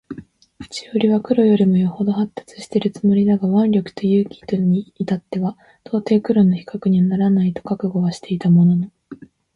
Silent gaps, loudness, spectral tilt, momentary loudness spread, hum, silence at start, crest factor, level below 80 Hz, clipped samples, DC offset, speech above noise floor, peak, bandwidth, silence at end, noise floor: none; -18 LUFS; -8.5 dB/octave; 11 LU; none; 0.1 s; 14 dB; -56 dBFS; under 0.1%; under 0.1%; 24 dB; -4 dBFS; 10.5 kHz; 0.4 s; -41 dBFS